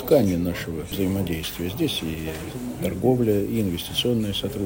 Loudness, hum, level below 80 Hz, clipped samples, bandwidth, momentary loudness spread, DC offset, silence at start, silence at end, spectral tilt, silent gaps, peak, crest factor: -25 LUFS; none; -46 dBFS; under 0.1%; 16.5 kHz; 10 LU; under 0.1%; 0 s; 0 s; -6 dB/octave; none; -4 dBFS; 18 dB